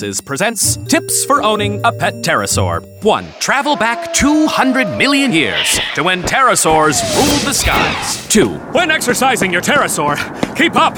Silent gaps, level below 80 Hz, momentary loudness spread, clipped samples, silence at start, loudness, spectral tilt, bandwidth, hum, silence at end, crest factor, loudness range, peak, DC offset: none; -36 dBFS; 5 LU; under 0.1%; 0 s; -13 LUFS; -3 dB/octave; over 20 kHz; none; 0 s; 14 dB; 2 LU; 0 dBFS; under 0.1%